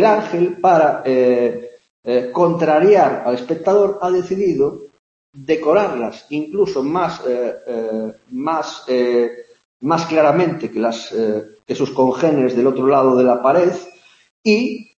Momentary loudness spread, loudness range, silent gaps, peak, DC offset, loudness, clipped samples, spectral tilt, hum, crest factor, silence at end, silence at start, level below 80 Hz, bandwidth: 11 LU; 5 LU; 1.90-2.03 s, 4.99-5.33 s, 9.65-9.80 s, 14.30-14.44 s; 0 dBFS; under 0.1%; -17 LUFS; under 0.1%; -6.5 dB/octave; none; 16 dB; 0.15 s; 0 s; -62 dBFS; 7.6 kHz